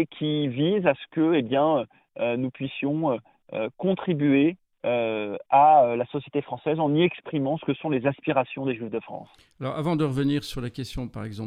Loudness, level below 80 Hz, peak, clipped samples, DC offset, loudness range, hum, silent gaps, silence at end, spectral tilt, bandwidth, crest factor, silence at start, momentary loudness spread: -25 LUFS; -54 dBFS; -8 dBFS; under 0.1%; under 0.1%; 5 LU; none; none; 0 s; -7.5 dB/octave; 13.5 kHz; 18 dB; 0 s; 12 LU